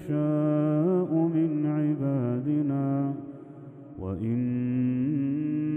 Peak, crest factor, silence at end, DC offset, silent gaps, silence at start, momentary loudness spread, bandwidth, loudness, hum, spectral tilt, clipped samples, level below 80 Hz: -14 dBFS; 12 dB; 0 s; under 0.1%; none; 0 s; 14 LU; 3.3 kHz; -27 LUFS; none; -12 dB/octave; under 0.1%; -62 dBFS